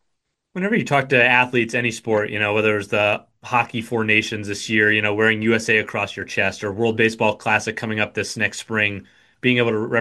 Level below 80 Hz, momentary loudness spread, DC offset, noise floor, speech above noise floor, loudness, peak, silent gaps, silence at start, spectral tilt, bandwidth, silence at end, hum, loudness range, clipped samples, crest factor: -60 dBFS; 8 LU; under 0.1%; -75 dBFS; 55 dB; -19 LUFS; -2 dBFS; none; 0.55 s; -4.5 dB/octave; 12.5 kHz; 0 s; none; 2 LU; under 0.1%; 18 dB